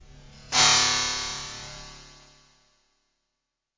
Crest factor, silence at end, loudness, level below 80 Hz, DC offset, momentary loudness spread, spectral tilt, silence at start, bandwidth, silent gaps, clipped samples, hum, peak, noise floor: 24 dB; 1.75 s; -21 LUFS; -52 dBFS; under 0.1%; 24 LU; 0.5 dB/octave; 0.1 s; 7.8 kHz; none; under 0.1%; none; -6 dBFS; -83 dBFS